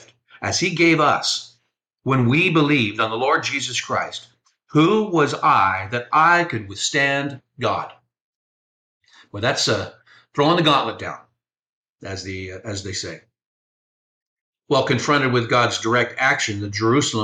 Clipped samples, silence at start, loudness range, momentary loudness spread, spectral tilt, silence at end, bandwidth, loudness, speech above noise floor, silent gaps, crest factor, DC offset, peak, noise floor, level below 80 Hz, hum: under 0.1%; 0.4 s; 8 LU; 15 LU; -4 dB/octave; 0 s; 9.8 kHz; -19 LUFS; 50 dB; 8.20-9.00 s, 11.59-11.63 s, 11.69-11.84 s, 11.90-11.96 s, 13.46-14.53 s; 16 dB; under 0.1%; -4 dBFS; -70 dBFS; -60 dBFS; none